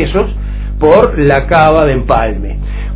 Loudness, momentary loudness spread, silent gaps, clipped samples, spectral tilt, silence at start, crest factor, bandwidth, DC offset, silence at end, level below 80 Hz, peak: -10 LUFS; 13 LU; none; 1%; -11 dB/octave; 0 s; 10 dB; 4 kHz; under 0.1%; 0 s; -18 dBFS; 0 dBFS